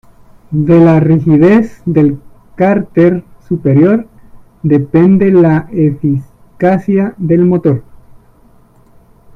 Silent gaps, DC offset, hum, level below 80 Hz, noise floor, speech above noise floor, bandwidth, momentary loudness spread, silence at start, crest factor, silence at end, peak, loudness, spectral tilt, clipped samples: none; under 0.1%; none; -42 dBFS; -44 dBFS; 35 dB; 6 kHz; 9 LU; 0.5 s; 10 dB; 1.55 s; 0 dBFS; -10 LUFS; -10.5 dB/octave; under 0.1%